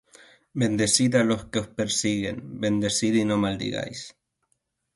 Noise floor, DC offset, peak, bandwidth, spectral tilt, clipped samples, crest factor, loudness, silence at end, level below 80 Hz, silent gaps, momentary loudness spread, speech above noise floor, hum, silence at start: -75 dBFS; under 0.1%; -6 dBFS; 12 kHz; -4 dB/octave; under 0.1%; 20 dB; -24 LUFS; 0.85 s; -54 dBFS; none; 12 LU; 50 dB; none; 0.55 s